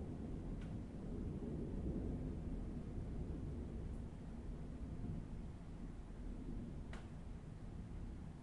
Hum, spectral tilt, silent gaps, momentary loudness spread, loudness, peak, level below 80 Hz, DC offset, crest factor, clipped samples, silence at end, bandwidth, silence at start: none; -8.5 dB/octave; none; 7 LU; -49 LUFS; -32 dBFS; -50 dBFS; under 0.1%; 16 dB; under 0.1%; 0 s; 11 kHz; 0 s